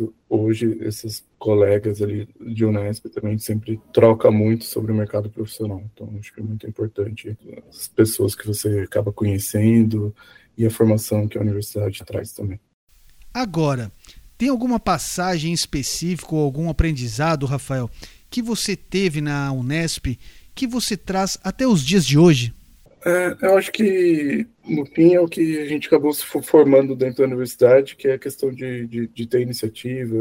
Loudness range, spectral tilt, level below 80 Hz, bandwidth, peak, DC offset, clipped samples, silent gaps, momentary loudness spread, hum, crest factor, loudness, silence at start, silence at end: 7 LU; -6 dB/octave; -40 dBFS; 16.5 kHz; -2 dBFS; under 0.1%; under 0.1%; 12.74-12.87 s; 15 LU; none; 18 dB; -20 LUFS; 0 s; 0 s